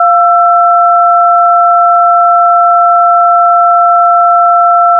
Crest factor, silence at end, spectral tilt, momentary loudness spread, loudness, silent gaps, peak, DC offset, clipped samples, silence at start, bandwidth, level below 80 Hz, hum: 6 dB; 0 s; -2.5 dB/octave; 0 LU; -6 LUFS; none; 0 dBFS; under 0.1%; 0.4%; 0 s; 1.6 kHz; -86 dBFS; none